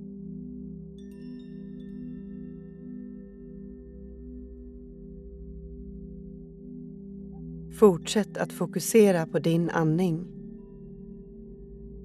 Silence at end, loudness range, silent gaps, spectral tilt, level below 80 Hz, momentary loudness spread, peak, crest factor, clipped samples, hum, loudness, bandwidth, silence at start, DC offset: 0 s; 19 LU; none; -6 dB/octave; -50 dBFS; 24 LU; -6 dBFS; 24 dB; under 0.1%; none; -25 LUFS; 14.5 kHz; 0 s; under 0.1%